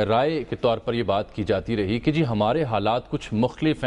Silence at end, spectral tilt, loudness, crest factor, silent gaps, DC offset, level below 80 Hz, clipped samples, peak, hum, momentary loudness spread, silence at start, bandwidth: 0 s; -7.5 dB/octave; -24 LUFS; 14 dB; none; under 0.1%; -46 dBFS; under 0.1%; -10 dBFS; none; 4 LU; 0 s; 10.5 kHz